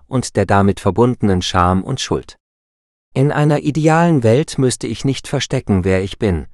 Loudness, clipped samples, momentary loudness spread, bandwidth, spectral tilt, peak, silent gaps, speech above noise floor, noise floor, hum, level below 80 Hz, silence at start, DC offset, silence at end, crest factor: -16 LUFS; under 0.1%; 7 LU; 12 kHz; -6 dB/octave; 0 dBFS; 2.40-3.12 s; over 75 dB; under -90 dBFS; none; -38 dBFS; 0.1 s; under 0.1%; 0.05 s; 16 dB